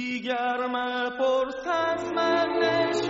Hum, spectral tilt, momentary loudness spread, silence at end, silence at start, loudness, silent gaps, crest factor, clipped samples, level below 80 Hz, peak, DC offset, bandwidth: none; -1.5 dB/octave; 4 LU; 0 s; 0 s; -26 LUFS; none; 16 dB; under 0.1%; -62 dBFS; -10 dBFS; under 0.1%; 7.6 kHz